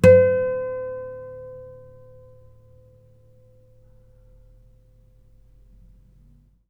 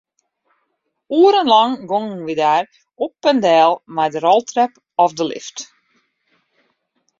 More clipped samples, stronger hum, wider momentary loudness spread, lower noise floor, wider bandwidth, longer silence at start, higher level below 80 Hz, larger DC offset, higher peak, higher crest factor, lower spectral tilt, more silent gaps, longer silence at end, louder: neither; neither; first, 29 LU vs 14 LU; second, -55 dBFS vs -71 dBFS; first, 11.5 kHz vs 7.6 kHz; second, 0.05 s vs 1.1 s; first, -50 dBFS vs -68 dBFS; neither; about the same, 0 dBFS vs -2 dBFS; first, 24 dB vs 16 dB; first, -7.5 dB/octave vs -4 dB/octave; neither; first, 5 s vs 1.55 s; second, -21 LUFS vs -16 LUFS